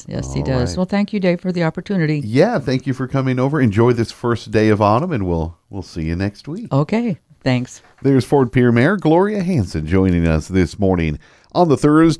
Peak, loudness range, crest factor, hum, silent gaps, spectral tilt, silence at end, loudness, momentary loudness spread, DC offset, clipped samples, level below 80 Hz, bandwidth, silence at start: 0 dBFS; 3 LU; 16 dB; none; none; -7.5 dB/octave; 0 s; -17 LUFS; 10 LU; under 0.1%; under 0.1%; -36 dBFS; 11 kHz; 0.1 s